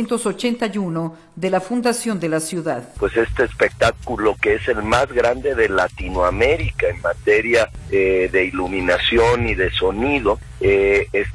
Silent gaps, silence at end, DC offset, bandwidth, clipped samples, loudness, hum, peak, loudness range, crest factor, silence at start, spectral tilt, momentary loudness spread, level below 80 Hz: none; 0 s; under 0.1%; 12 kHz; under 0.1%; -19 LUFS; none; -2 dBFS; 3 LU; 16 dB; 0 s; -5 dB/octave; 6 LU; -34 dBFS